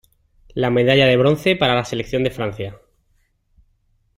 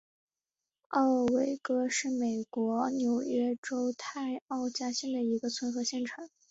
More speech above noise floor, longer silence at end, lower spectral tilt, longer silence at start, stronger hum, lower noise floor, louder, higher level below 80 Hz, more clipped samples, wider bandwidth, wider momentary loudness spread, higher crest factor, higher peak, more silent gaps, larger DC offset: second, 46 dB vs over 59 dB; first, 1.4 s vs 0.25 s; first, -6 dB/octave vs -3.5 dB/octave; second, 0.55 s vs 0.9 s; neither; second, -63 dBFS vs under -90 dBFS; first, -17 LUFS vs -32 LUFS; first, -48 dBFS vs -74 dBFS; neither; first, 16 kHz vs 8 kHz; first, 16 LU vs 8 LU; about the same, 18 dB vs 16 dB; first, -2 dBFS vs -16 dBFS; second, none vs 3.58-3.63 s, 4.42-4.46 s; neither